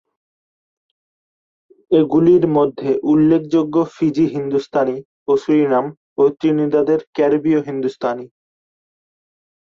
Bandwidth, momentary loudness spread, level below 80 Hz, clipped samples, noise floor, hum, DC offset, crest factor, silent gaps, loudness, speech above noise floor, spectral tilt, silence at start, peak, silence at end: 7.2 kHz; 8 LU; -58 dBFS; under 0.1%; under -90 dBFS; none; under 0.1%; 14 dB; 5.05-5.26 s, 5.97-6.16 s, 7.07-7.13 s; -17 LUFS; over 74 dB; -8.5 dB/octave; 1.9 s; -4 dBFS; 1.35 s